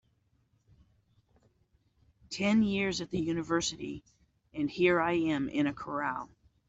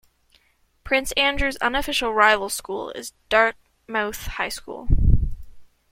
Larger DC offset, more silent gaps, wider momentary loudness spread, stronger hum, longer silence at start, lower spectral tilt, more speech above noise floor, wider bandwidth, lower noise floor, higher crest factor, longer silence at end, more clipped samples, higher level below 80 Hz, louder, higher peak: neither; neither; about the same, 15 LU vs 13 LU; neither; first, 2.3 s vs 0.85 s; about the same, -5 dB/octave vs -4 dB/octave; about the same, 42 dB vs 40 dB; second, 8.2 kHz vs 16.5 kHz; first, -72 dBFS vs -62 dBFS; about the same, 20 dB vs 20 dB; first, 0.45 s vs 0.25 s; neither; second, -62 dBFS vs -30 dBFS; second, -31 LUFS vs -22 LUFS; second, -14 dBFS vs -2 dBFS